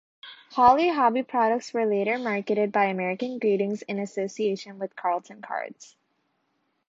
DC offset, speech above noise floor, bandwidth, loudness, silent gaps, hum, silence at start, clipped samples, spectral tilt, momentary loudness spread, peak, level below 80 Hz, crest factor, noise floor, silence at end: under 0.1%; 49 dB; 7.8 kHz; -25 LUFS; none; none; 0.25 s; under 0.1%; -5.5 dB/octave; 13 LU; -6 dBFS; -66 dBFS; 20 dB; -73 dBFS; 1.05 s